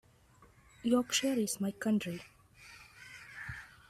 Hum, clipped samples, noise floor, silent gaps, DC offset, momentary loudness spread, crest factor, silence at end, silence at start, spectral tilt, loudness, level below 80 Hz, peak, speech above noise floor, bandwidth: none; under 0.1%; -63 dBFS; none; under 0.1%; 22 LU; 18 dB; 0.25 s; 0.4 s; -3.5 dB/octave; -34 LUFS; -66 dBFS; -18 dBFS; 31 dB; 15.5 kHz